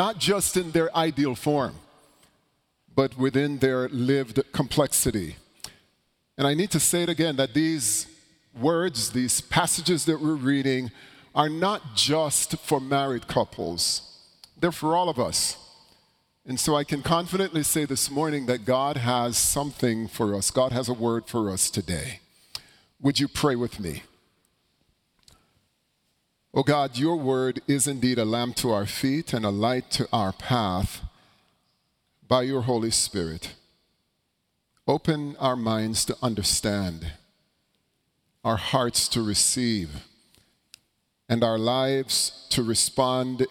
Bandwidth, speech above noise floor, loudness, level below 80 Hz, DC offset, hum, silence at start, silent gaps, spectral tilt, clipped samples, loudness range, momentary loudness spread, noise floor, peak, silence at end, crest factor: 18 kHz; 51 dB; -25 LUFS; -50 dBFS; under 0.1%; none; 0 s; none; -4 dB/octave; under 0.1%; 4 LU; 9 LU; -75 dBFS; -6 dBFS; 0 s; 20 dB